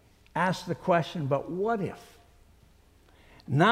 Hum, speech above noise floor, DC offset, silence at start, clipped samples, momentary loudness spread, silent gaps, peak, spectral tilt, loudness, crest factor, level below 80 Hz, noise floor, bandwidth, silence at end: none; 30 dB; under 0.1%; 0.35 s; under 0.1%; 10 LU; none; -8 dBFS; -6.5 dB/octave; -29 LUFS; 20 dB; -60 dBFS; -59 dBFS; 15 kHz; 0 s